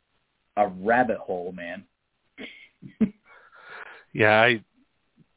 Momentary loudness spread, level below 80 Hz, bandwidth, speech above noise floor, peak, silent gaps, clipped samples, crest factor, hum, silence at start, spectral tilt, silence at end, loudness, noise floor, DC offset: 23 LU; -62 dBFS; 4 kHz; 49 dB; -4 dBFS; none; under 0.1%; 24 dB; none; 0.55 s; -9 dB/octave; 0.75 s; -23 LUFS; -73 dBFS; under 0.1%